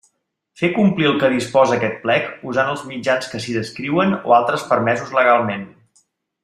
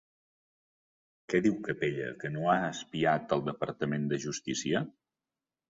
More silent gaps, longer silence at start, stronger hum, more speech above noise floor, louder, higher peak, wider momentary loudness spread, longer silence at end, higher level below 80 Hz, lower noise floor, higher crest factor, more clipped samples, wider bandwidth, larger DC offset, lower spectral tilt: neither; second, 0.6 s vs 1.3 s; neither; second, 51 dB vs over 59 dB; first, -18 LUFS vs -32 LUFS; first, -2 dBFS vs -12 dBFS; about the same, 9 LU vs 7 LU; second, 0.75 s vs 0.9 s; first, -60 dBFS vs -68 dBFS; second, -68 dBFS vs under -90 dBFS; about the same, 16 dB vs 20 dB; neither; first, 13.5 kHz vs 7.8 kHz; neither; about the same, -5.5 dB/octave vs -5 dB/octave